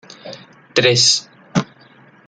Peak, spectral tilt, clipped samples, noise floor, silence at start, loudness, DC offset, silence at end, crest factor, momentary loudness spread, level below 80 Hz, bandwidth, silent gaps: 0 dBFS; -2.5 dB/octave; under 0.1%; -48 dBFS; 0.25 s; -15 LUFS; under 0.1%; 0.65 s; 18 dB; 24 LU; -58 dBFS; 12 kHz; none